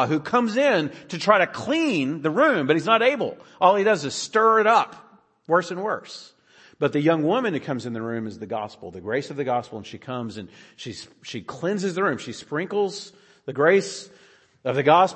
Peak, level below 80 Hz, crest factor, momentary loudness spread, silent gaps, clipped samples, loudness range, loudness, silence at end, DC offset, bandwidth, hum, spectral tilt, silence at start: -2 dBFS; -70 dBFS; 22 dB; 18 LU; none; under 0.1%; 10 LU; -22 LUFS; 0 s; under 0.1%; 8.8 kHz; none; -5 dB/octave; 0 s